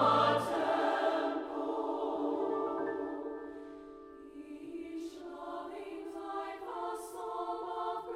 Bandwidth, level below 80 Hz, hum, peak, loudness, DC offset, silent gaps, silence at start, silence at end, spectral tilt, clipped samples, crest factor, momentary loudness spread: 16 kHz; -72 dBFS; none; -16 dBFS; -36 LUFS; under 0.1%; none; 0 s; 0 s; -5.5 dB/octave; under 0.1%; 20 dB; 17 LU